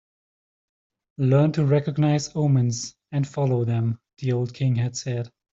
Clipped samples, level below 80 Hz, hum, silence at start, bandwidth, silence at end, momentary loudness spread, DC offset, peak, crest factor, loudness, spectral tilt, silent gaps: under 0.1%; -60 dBFS; none; 1.2 s; 7.8 kHz; 0.25 s; 10 LU; under 0.1%; -8 dBFS; 16 dB; -24 LUFS; -7 dB/octave; none